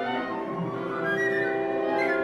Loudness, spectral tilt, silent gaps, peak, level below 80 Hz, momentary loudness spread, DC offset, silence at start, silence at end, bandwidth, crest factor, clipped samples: -27 LUFS; -6.5 dB/octave; none; -14 dBFS; -66 dBFS; 6 LU; under 0.1%; 0 s; 0 s; 12 kHz; 14 dB; under 0.1%